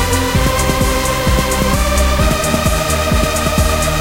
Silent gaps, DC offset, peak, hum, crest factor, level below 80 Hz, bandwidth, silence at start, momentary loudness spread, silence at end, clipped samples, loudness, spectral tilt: none; under 0.1%; 0 dBFS; none; 14 dB; -18 dBFS; 17 kHz; 0 s; 1 LU; 0 s; under 0.1%; -14 LUFS; -4 dB/octave